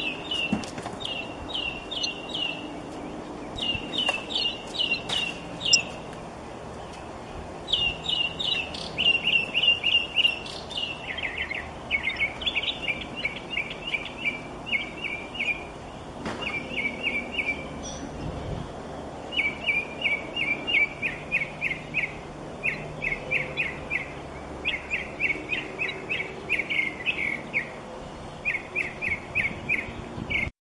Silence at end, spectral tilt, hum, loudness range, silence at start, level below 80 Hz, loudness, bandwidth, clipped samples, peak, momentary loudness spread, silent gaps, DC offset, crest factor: 0.1 s; -2.5 dB/octave; none; 7 LU; 0 s; -50 dBFS; -27 LUFS; 11.5 kHz; under 0.1%; -4 dBFS; 15 LU; none; under 0.1%; 26 dB